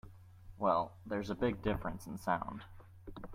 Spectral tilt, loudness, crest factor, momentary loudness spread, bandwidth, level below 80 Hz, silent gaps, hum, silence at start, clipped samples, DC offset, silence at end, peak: -7 dB/octave; -37 LUFS; 20 dB; 21 LU; 16 kHz; -54 dBFS; none; none; 0.05 s; under 0.1%; under 0.1%; 0 s; -18 dBFS